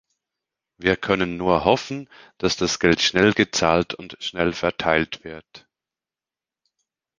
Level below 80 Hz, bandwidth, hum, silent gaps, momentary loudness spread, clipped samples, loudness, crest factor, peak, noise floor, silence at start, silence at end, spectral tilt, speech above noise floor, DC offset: -48 dBFS; 10 kHz; none; none; 13 LU; under 0.1%; -21 LUFS; 22 dB; -2 dBFS; under -90 dBFS; 0.8 s; 1.6 s; -4 dB/octave; over 68 dB; under 0.1%